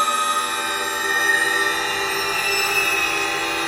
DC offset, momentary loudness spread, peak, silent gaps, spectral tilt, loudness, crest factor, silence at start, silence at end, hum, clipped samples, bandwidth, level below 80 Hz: under 0.1%; 4 LU; -6 dBFS; none; -0.5 dB/octave; -19 LUFS; 16 dB; 0 s; 0 s; none; under 0.1%; 16 kHz; -54 dBFS